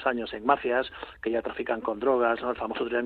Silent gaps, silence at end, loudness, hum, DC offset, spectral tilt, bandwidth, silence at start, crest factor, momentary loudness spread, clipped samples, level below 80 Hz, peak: none; 0 s; -28 LUFS; none; under 0.1%; -7 dB/octave; 4.7 kHz; 0 s; 20 dB; 7 LU; under 0.1%; -58 dBFS; -6 dBFS